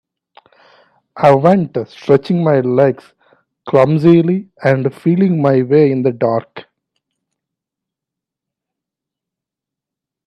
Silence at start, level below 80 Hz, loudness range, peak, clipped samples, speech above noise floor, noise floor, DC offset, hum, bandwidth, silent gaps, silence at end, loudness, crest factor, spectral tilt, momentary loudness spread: 1.15 s; -58 dBFS; 6 LU; 0 dBFS; under 0.1%; 72 dB; -84 dBFS; under 0.1%; none; 8.4 kHz; none; 3.65 s; -13 LUFS; 16 dB; -9.5 dB/octave; 7 LU